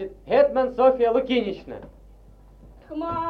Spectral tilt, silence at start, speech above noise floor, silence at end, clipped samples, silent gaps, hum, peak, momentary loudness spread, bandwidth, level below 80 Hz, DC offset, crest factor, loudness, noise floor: -7 dB/octave; 0 s; 26 dB; 0 s; under 0.1%; none; none; -6 dBFS; 18 LU; 5.8 kHz; -50 dBFS; under 0.1%; 18 dB; -21 LUFS; -49 dBFS